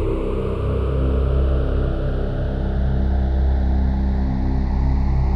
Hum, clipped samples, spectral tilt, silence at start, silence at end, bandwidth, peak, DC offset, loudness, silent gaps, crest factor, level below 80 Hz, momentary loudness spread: none; under 0.1%; -10 dB/octave; 0 s; 0 s; 4.8 kHz; -8 dBFS; under 0.1%; -22 LUFS; none; 10 dB; -20 dBFS; 4 LU